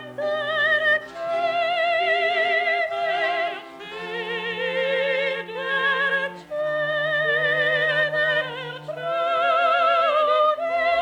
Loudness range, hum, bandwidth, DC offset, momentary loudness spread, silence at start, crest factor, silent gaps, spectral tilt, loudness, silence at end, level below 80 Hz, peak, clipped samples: 4 LU; none; 10.5 kHz; under 0.1%; 10 LU; 0 s; 14 dB; none; -4 dB/octave; -22 LUFS; 0 s; -66 dBFS; -8 dBFS; under 0.1%